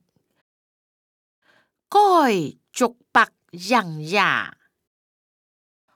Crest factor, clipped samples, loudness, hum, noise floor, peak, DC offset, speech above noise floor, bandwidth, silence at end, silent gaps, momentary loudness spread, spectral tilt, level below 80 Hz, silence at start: 20 dB; under 0.1%; -20 LUFS; none; -54 dBFS; -4 dBFS; under 0.1%; 34 dB; 19 kHz; 1.45 s; none; 10 LU; -4 dB/octave; -74 dBFS; 1.9 s